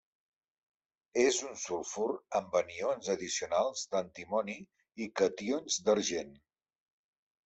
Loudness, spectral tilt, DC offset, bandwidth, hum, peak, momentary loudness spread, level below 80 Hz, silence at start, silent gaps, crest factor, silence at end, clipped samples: -33 LUFS; -2.5 dB/octave; under 0.1%; 8.2 kHz; none; -16 dBFS; 10 LU; -74 dBFS; 1.15 s; none; 20 dB; 1.1 s; under 0.1%